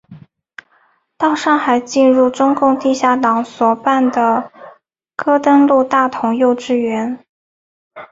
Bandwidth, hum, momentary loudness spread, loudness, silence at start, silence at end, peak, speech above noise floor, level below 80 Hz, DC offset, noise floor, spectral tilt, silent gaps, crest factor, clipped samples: 7.8 kHz; none; 9 LU; -14 LUFS; 0.1 s; 0.05 s; -2 dBFS; 44 dB; -60 dBFS; under 0.1%; -57 dBFS; -4.5 dB/octave; 7.29-7.91 s; 14 dB; under 0.1%